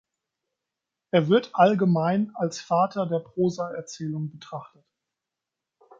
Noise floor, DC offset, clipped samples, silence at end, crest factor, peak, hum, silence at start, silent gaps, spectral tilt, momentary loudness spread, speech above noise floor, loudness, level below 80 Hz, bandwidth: -87 dBFS; under 0.1%; under 0.1%; 1.35 s; 22 dB; -4 dBFS; none; 1.15 s; none; -7 dB/octave; 14 LU; 63 dB; -24 LUFS; -72 dBFS; 7.8 kHz